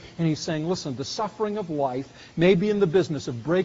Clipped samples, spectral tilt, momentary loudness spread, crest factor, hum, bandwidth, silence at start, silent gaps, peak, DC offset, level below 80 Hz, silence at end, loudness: under 0.1%; -6 dB/octave; 10 LU; 18 dB; none; 7.8 kHz; 0 s; none; -6 dBFS; under 0.1%; -56 dBFS; 0 s; -25 LUFS